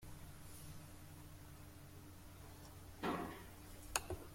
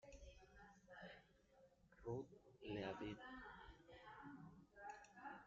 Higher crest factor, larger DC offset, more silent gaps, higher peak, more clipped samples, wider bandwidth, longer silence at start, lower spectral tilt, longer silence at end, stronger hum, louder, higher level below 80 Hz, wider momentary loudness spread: first, 32 dB vs 22 dB; neither; neither; first, -18 dBFS vs -36 dBFS; neither; first, 16.5 kHz vs 7.4 kHz; about the same, 0 s vs 0 s; about the same, -3.5 dB/octave vs -4.5 dB/octave; about the same, 0 s vs 0 s; neither; first, -50 LUFS vs -57 LUFS; first, -62 dBFS vs -72 dBFS; about the same, 14 LU vs 14 LU